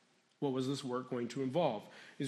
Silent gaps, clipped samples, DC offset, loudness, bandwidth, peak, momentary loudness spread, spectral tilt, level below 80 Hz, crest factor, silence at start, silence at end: none; under 0.1%; under 0.1%; -38 LUFS; 13 kHz; -20 dBFS; 8 LU; -6 dB/octave; -86 dBFS; 18 dB; 0.4 s; 0 s